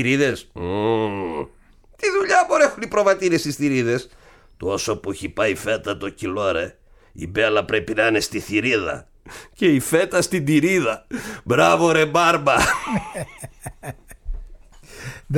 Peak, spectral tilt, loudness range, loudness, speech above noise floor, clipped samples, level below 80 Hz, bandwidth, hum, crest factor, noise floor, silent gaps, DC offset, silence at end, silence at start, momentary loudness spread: -4 dBFS; -4.5 dB/octave; 5 LU; -20 LUFS; 30 dB; under 0.1%; -44 dBFS; 18 kHz; none; 18 dB; -50 dBFS; none; under 0.1%; 0 s; 0 s; 20 LU